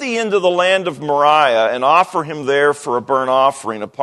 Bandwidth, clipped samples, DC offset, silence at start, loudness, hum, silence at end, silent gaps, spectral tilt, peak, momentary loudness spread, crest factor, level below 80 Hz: 12 kHz; under 0.1%; under 0.1%; 0 s; -15 LUFS; none; 0 s; none; -4 dB/octave; 0 dBFS; 7 LU; 16 dB; -66 dBFS